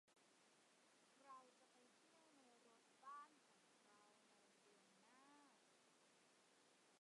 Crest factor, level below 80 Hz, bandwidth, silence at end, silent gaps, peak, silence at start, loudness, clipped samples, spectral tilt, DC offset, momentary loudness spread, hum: 20 dB; under -90 dBFS; 11 kHz; 0 s; none; -50 dBFS; 0.05 s; -64 LUFS; under 0.1%; -2 dB/octave; under 0.1%; 5 LU; none